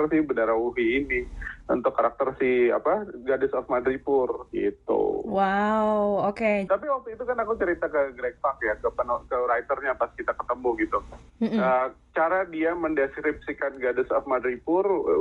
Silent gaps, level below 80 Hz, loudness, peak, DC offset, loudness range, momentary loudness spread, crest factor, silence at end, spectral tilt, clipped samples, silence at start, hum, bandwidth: none; -50 dBFS; -26 LUFS; -10 dBFS; under 0.1%; 2 LU; 6 LU; 14 dB; 0 s; -7.5 dB/octave; under 0.1%; 0 s; none; 7.4 kHz